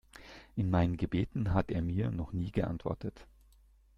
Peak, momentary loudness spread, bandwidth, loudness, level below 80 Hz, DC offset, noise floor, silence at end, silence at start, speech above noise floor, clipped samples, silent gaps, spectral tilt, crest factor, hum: -14 dBFS; 12 LU; 7 kHz; -34 LUFS; -50 dBFS; under 0.1%; -63 dBFS; 0.75 s; 0.15 s; 30 dB; under 0.1%; none; -9 dB/octave; 20 dB; none